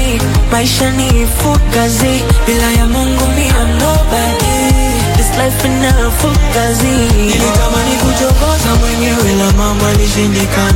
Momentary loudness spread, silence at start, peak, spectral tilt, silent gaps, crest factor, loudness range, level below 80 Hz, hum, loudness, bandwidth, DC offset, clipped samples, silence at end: 1 LU; 0 s; 0 dBFS; -4.5 dB/octave; none; 10 dB; 0 LU; -14 dBFS; none; -11 LUFS; 17 kHz; under 0.1%; under 0.1%; 0 s